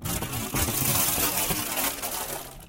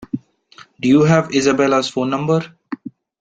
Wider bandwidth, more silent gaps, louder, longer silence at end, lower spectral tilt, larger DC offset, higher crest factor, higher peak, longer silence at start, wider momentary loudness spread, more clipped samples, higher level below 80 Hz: first, 17 kHz vs 9.2 kHz; neither; second, -25 LUFS vs -16 LUFS; second, 0 s vs 0.3 s; second, -2.5 dB/octave vs -6 dB/octave; neither; about the same, 18 dB vs 16 dB; second, -10 dBFS vs -2 dBFS; about the same, 0 s vs 0 s; second, 8 LU vs 18 LU; neither; first, -42 dBFS vs -56 dBFS